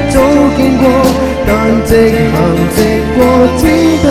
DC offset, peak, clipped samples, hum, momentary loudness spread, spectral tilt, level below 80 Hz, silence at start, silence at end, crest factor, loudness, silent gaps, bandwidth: under 0.1%; 0 dBFS; 0.5%; none; 3 LU; -6 dB/octave; -22 dBFS; 0 s; 0 s; 8 dB; -9 LUFS; none; 16 kHz